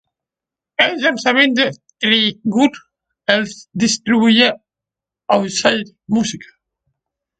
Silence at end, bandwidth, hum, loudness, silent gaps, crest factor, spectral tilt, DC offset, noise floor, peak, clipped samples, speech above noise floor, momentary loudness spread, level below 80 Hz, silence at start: 0.95 s; 9.2 kHz; none; -16 LUFS; none; 18 dB; -3.5 dB/octave; under 0.1%; -87 dBFS; 0 dBFS; under 0.1%; 72 dB; 11 LU; -58 dBFS; 0.8 s